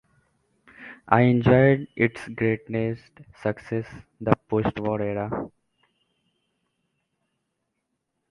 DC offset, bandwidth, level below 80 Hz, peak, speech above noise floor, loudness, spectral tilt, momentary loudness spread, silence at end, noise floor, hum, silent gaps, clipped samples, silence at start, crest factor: under 0.1%; 10.5 kHz; -52 dBFS; 0 dBFS; 55 dB; -24 LUFS; -9 dB/octave; 21 LU; 2.85 s; -79 dBFS; none; none; under 0.1%; 0.8 s; 26 dB